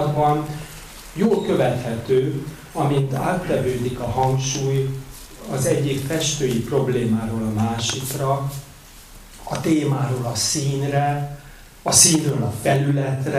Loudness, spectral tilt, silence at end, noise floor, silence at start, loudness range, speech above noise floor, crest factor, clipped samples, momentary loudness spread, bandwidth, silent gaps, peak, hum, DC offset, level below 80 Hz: -21 LUFS; -4.5 dB/octave; 0 s; -43 dBFS; 0 s; 5 LU; 22 dB; 22 dB; under 0.1%; 12 LU; 16 kHz; none; 0 dBFS; none; under 0.1%; -44 dBFS